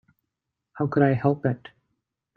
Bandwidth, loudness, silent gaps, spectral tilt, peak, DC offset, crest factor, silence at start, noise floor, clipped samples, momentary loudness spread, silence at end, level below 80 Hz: 4.6 kHz; -24 LUFS; none; -11 dB/octave; -6 dBFS; under 0.1%; 20 dB; 0.75 s; -83 dBFS; under 0.1%; 9 LU; 0.8 s; -64 dBFS